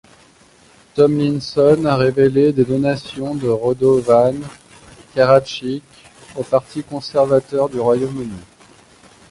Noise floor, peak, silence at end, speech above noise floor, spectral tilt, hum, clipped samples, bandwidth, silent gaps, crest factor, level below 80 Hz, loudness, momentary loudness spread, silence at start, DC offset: -49 dBFS; 0 dBFS; 0.85 s; 34 dB; -7 dB/octave; none; under 0.1%; 11.5 kHz; none; 16 dB; -50 dBFS; -16 LUFS; 15 LU; 0.95 s; under 0.1%